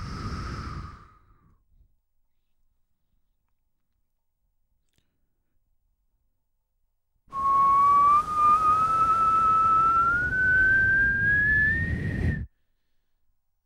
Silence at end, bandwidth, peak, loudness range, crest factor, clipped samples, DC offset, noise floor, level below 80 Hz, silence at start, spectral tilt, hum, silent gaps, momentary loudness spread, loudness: 1.2 s; 12.5 kHz; -12 dBFS; 8 LU; 14 dB; under 0.1%; under 0.1%; -74 dBFS; -44 dBFS; 0 s; -6 dB/octave; none; none; 16 LU; -21 LUFS